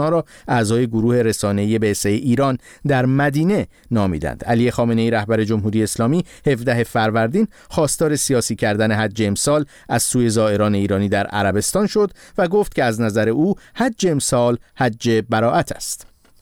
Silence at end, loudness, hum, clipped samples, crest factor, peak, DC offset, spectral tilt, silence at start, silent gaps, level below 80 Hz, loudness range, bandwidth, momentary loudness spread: 0.4 s; -18 LUFS; none; under 0.1%; 12 dB; -6 dBFS; 0.1%; -5.5 dB/octave; 0 s; none; -44 dBFS; 1 LU; 17.5 kHz; 5 LU